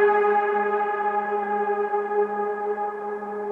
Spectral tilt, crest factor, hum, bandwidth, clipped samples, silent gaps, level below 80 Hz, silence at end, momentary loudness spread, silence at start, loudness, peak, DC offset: -7 dB/octave; 14 dB; none; 3.9 kHz; under 0.1%; none; -72 dBFS; 0 s; 8 LU; 0 s; -24 LUFS; -8 dBFS; under 0.1%